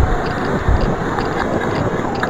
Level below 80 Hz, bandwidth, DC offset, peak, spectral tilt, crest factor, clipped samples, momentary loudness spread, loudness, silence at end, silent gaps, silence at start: -24 dBFS; 15.5 kHz; under 0.1%; 0 dBFS; -7 dB/octave; 16 dB; under 0.1%; 2 LU; -19 LUFS; 0 s; none; 0 s